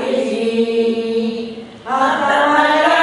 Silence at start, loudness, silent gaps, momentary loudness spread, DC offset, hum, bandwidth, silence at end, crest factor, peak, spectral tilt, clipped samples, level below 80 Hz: 0 s; -16 LUFS; none; 12 LU; under 0.1%; none; 11.5 kHz; 0 s; 14 dB; -2 dBFS; -4 dB/octave; under 0.1%; -58 dBFS